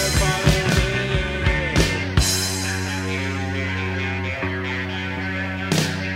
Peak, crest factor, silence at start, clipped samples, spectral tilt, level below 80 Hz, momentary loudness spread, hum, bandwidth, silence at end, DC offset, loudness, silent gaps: -2 dBFS; 20 dB; 0 s; under 0.1%; -4 dB/octave; -30 dBFS; 7 LU; none; 16 kHz; 0 s; under 0.1%; -22 LUFS; none